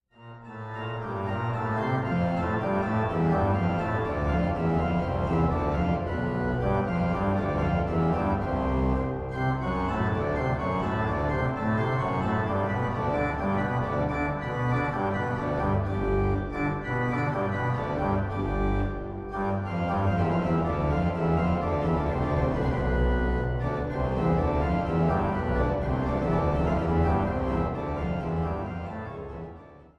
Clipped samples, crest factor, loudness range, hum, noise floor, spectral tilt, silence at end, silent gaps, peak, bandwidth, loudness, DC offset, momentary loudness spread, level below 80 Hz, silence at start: under 0.1%; 14 dB; 2 LU; none; -47 dBFS; -9 dB/octave; 0.15 s; none; -12 dBFS; 8.4 kHz; -27 LUFS; under 0.1%; 5 LU; -36 dBFS; 0.2 s